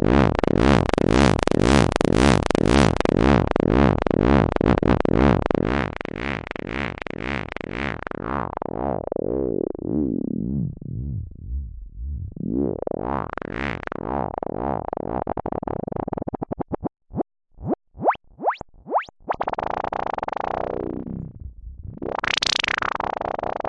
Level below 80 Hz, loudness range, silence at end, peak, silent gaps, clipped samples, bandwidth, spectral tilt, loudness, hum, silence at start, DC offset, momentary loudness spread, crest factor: -34 dBFS; 10 LU; 0 s; -2 dBFS; none; under 0.1%; 11.5 kHz; -6 dB/octave; -23 LUFS; none; 0 s; under 0.1%; 14 LU; 22 dB